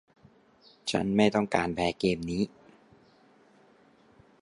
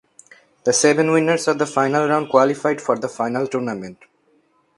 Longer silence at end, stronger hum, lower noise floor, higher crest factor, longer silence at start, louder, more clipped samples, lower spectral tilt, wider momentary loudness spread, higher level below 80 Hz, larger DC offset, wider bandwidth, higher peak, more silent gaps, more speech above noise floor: first, 1.95 s vs 0.85 s; neither; about the same, -61 dBFS vs -61 dBFS; about the same, 22 dB vs 20 dB; first, 0.85 s vs 0.65 s; second, -28 LUFS vs -19 LUFS; neither; first, -5.5 dB/octave vs -4 dB/octave; about the same, 8 LU vs 9 LU; first, -56 dBFS vs -66 dBFS; neither; about the same, 11.5 kHz vs 11.5 kHz; second, -10 dBFS vs 0 dBFS; neither; second, 33 dB vs 42 dB